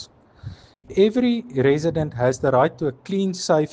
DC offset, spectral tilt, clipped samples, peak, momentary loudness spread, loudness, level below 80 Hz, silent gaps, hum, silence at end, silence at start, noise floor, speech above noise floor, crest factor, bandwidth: under 0.1%; -6 dB/octave; under 0.1%; -4 dBFS; 22 LU; -21 LUFS; -52 dBFS; none; none; 0.05 s; 0 s; -40 dBFS; 20 dB; 16 dB; 9.6 kHz